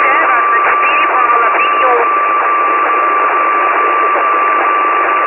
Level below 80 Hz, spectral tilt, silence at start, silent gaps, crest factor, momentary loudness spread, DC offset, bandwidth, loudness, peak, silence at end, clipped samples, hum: -56 dBFS; -5.5 dB/octave; 0 s; none; 10 dB; 2 LU; under 0.1%; 4 kHz; -10 LUFS; 0 dBFS; 0 s; under 0.1%; none